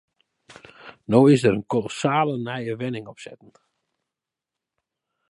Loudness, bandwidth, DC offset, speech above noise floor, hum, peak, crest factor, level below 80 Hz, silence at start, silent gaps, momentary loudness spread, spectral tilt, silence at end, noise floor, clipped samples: -21 LUFS; 11.5 kHz; under 0.1%; 66 dB; none; -2 dBFS; 22 dB; -62 dBFS; 0.85 s; none; 26 LU; -6.5 dB/octave; 1.95 s; -87 dBFS; under 0.1%